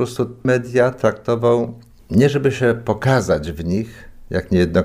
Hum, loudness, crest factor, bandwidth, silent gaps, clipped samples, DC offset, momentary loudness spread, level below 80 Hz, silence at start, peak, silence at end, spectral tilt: none; -18 LUFS; 14 dB; 15.5 kHz; none; under 0.1%; under 0.1%; 8 LU; -40 dBFS; 0 s; -4 dBFS; 0 s; -7 dB/octave